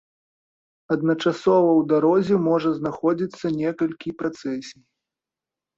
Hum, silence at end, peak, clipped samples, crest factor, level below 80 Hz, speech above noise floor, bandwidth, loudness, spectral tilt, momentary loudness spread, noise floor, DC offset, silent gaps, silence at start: none; 1.05 s; -8 dBFS; under 0.1%; 16 dB; -64 dBFS; 67 dB; 7.6 kHz; -22 LUFS; -7.5 dB/octave; 11 LU; -89 dBFS; under 0.1%; none; 0.9 s